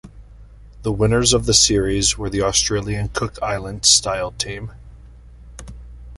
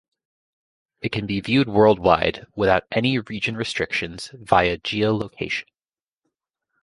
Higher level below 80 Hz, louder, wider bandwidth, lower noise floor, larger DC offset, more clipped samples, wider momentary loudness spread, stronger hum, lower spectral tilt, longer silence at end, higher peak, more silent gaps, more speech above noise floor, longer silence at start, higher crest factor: first, -34 dBFS vs -48 dBFS; first, -17 LUFS vs -21 LUFS; about the same, 11.5 kHz vs 11.5 kHz; second, -42 dBFS vs under -90 dBFS; neither; neither; first, 15 LU vs 11 LU; neither; second, -3 dB/octave vs -6 dB/octave; second, 0 s vs 1.2 s; about the same, 0 dBFS vs -2 dBFS; neither; second, 23 dB vs over 69 dB; second, 0.05 s vs 1.05 s; about the same, 20 dB vs 20 dB